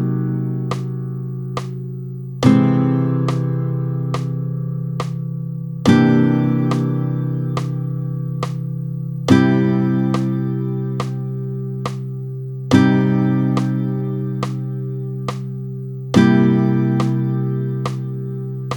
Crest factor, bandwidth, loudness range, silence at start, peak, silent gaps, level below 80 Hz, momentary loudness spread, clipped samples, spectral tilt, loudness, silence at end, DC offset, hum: 18 dB; 18.5 kHz; 2 LU; 0 s; 0 dBFS; none; -56 dBFS; 13 LU; under 0.1%; -8 dB/octave; -19 LUFS; 0 s; under 0.1%; none